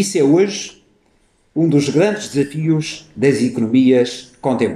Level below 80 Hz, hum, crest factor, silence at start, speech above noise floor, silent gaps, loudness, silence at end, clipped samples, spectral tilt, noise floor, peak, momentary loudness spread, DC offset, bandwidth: -58 dBFS; none; 14 dB; 0 s; 42 dB; none; -16 LUFS; 0 s; under 0.1%; -6 dB/octave; -58 dBFS; -2 dBFS; 11 LU; under 0.1%; 13.5 kHz